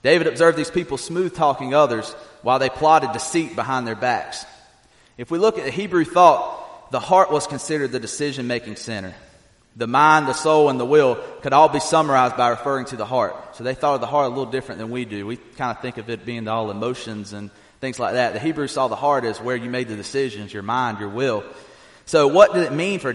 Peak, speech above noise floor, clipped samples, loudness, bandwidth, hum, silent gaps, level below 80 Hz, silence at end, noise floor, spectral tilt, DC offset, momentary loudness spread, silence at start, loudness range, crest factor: 0 dBFS; 35 dB; under 0.1%; -20 LUFS; 11.5 kHz; none; none; -58 dBFS; 0 s; -54 dBFS; -4.5 dB/octave; under 0.1%; 15 LU; 0.05 s; 8 LU; 20 dB